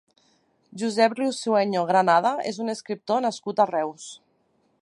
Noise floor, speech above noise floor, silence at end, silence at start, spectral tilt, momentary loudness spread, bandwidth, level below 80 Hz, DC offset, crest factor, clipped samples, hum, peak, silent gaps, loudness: -67 dBFS; 44 dB; 0.65 s; 0.75 s; -4.5 dB/octave; 12 LU; 11.5 kHz; -78 dBFS; under 0.1%; 20 dB; under 0.1%; none; -6 dBFS; none; -24 LUFS